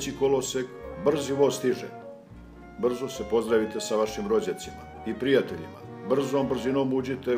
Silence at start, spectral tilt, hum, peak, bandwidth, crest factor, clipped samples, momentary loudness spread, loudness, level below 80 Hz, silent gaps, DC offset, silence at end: 0 s; -5 dB/octave; none; -10 dBFS; 16 kHz; 18 dB; under 0.1%; 16 LU; -27 LUFS; -54 dBFS; none; under 0.1%; 0 s